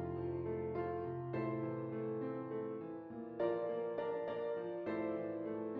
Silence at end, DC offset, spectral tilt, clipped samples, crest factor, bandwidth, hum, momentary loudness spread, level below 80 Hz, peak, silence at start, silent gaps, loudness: 0 s; under 0.1%; -7.5 dB/octave; under 0.1%; 16 dB; 5 kHz; none; 4 LU; -74 dBFS; -26 dBFS; 0 s; none; -41 LUFS